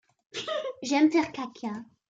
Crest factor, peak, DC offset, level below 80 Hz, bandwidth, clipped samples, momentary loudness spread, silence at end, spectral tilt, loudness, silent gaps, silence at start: 18 dB; -12 dBFS; under 0.1%; -74 dBFS; 7.8 kHz; under 0.1%; 15 LU; 0.25 s; -4 dB/octave; -28 LUFS; none; 0.35 s